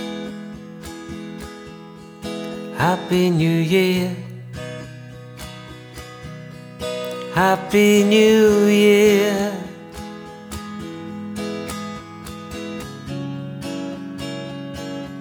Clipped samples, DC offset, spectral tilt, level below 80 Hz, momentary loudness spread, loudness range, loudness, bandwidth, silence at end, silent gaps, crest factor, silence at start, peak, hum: under 0.1%; under 0.1%; -5.5 dB/octave; -48 dBFS; 22 LU; 15 LU; -19 LUFS; over 20 kHz; 0 s; none; 18 dB; 0 s; -4 dBFS; none